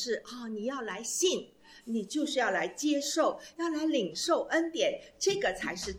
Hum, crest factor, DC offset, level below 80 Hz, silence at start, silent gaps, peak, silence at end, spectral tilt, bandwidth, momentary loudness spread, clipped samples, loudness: none; 16 dB; under 0.1%; -64 dBFS; 0 s; none; -16 dBFS; 0 s; -2.5 dB/octave; 16.5 kHz; 8 LU; under 0.1%; -31 LUFS